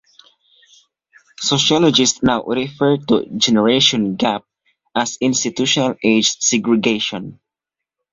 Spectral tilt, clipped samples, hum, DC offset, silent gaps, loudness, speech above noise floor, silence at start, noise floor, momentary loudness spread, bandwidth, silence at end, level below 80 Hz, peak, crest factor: -3 dB/octave; under 0.1%; none; under 0.1%; none; -16 LUFS; 68 dB; 1.4 s; -85 dBFS; 10 LU; 7.8 kHz; 0.8 s; -54 dBFS; 0 dBFS; 18 dB